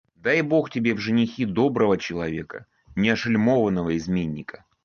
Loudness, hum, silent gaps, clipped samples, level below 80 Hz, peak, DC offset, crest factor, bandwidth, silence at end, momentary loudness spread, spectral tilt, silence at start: -23 LUFS; none; none; under 0.1%; -52 dBFS; -8 dBFS; under 0.1%; 16 dB; 6.8 kHz; 0.35 s; 13 LU; -7 dB/octave; 0.25 s